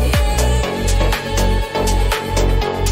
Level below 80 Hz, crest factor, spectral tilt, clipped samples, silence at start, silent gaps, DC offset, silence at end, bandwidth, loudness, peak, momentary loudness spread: -18 dBFS; 12 dB; -4.5 dB/octave; under 0.1%; 0 s; none; under 0.1%; 0 s; 16.5 kHz; -18 LUFS; -4 dBFS; 2 LU